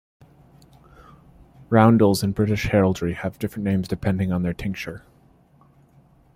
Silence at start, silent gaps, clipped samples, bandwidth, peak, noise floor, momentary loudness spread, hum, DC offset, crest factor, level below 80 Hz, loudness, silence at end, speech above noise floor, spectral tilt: 1.7 s; none; under 0.1%; 16 kHz; -4 dBFS; -56 dBFS; 13 LU; none; under 0.1%; 20 dB; -46 dBFS; -21 LUFS; 1.4 s; 35 dB; -7 dB/octave